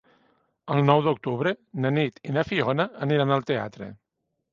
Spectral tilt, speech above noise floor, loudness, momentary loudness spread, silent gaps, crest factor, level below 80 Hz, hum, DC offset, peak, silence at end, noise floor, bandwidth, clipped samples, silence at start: -8 dB/octave; 42 dB; -25 LUFS; 12 LU; none; 22 dB; -62 dBFS; none; under 0.1%; -4 dBFS; 0.6 s; -66 dBFS; 7 kHz; under 0.1%; 0.65 s